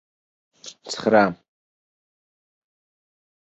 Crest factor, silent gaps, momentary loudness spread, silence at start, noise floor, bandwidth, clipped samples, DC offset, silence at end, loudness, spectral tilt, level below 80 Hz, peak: 24 dB; none; 24 LU; 0.65 s; under -90 dBFS; 8.2 kHz; under 0.1%; under 0.1%; 2.1 s; -20 LUFS; -5 dB/octave; -66 dBFS; -2 dBFS